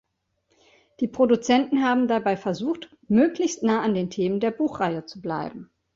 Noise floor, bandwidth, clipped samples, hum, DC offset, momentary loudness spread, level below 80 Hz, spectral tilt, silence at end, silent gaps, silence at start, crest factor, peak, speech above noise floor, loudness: -72 dBFS; 7.8 kHz; under 0.1%; none; under 0.1%; 11 LU; -62 dBFS; -5.5 dB/octave; 0.3 s; none; 1 s; 16 dB; -8 dBFS; 49 dB; -24 LUFS